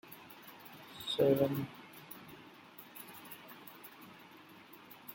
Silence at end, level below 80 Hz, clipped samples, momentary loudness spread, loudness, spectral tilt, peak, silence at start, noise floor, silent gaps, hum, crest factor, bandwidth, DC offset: 0 s; -76 dBFS; under 0.1%; 23 LU; -35 LUFS; -6 dB/octave; -16 dBFS; 0.05 s; -57 dBFS; none; none; 24 dB; 17 kHz; under 0.1%